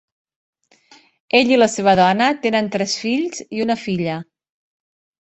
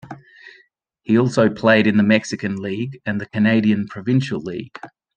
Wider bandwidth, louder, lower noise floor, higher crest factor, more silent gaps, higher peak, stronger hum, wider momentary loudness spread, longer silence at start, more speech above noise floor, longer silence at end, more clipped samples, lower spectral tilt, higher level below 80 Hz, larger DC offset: about the same, 8.4 kHz vs 9 kHz; about the same, -17 LUFS vs -18 LUFS; second, -52 dBFS vs -58 dBFS; about the same, 18 dB vs 18 dB; neither; about the same, -2 dBFS vs -2 dBFS; neither; second, 10 LU vs 21 LU; first, 1.35 s vs 0.05 s; second, 34 dB vs 40 dB; first, 1 s vs 0.3 s; neither; second, -4.5 dB/octave vs -6.5 dB/octave; about the same, -58 dBFS vs -60 dBFS; neither